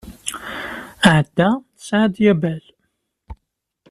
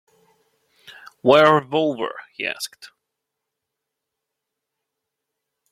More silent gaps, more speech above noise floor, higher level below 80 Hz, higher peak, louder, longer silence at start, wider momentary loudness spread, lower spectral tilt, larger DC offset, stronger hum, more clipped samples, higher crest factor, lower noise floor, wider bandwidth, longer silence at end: neither; second, 56 dB vs 63 dB; first, -48 dBFS vs -68 dBFS; about the same, -2 dBFS vs -2 dBFS; about the same, -18 LUFS vs -19 LUFS; second, 0.05 s vs 1.25 s; about the same, 14 LU vs 16 LU; about the same, -5.5 dB/octave vs -5 dB/octave; neither; neither; neither; about the same, 18 dB vs 22 dB; second, -73 dBFS vs -82 dBFS; about the same, 13.5 kHz vs 14.5 kHz; second, 0.55 s vs 2.85 s